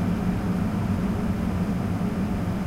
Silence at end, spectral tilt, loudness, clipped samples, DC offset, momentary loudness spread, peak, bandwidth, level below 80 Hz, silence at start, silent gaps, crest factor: 0 s; -8 dB/octave; -26 LUFS; under 0.1%; under 0.1%; 1 LU; -14 dBFS; 16 kHz; -36 dBFS; 0 s; none; 12 dB